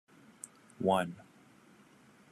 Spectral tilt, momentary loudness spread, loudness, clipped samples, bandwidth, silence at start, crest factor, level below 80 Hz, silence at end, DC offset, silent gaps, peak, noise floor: -5.5 dB/octave; 19 LU; -33 LUFS; under 0.1%; 13.5 kHz; 0.8 s; 22 dB; -82 dBFS; 1.1 s; under 0.1%; none; -16 dBFS; -61 dBFS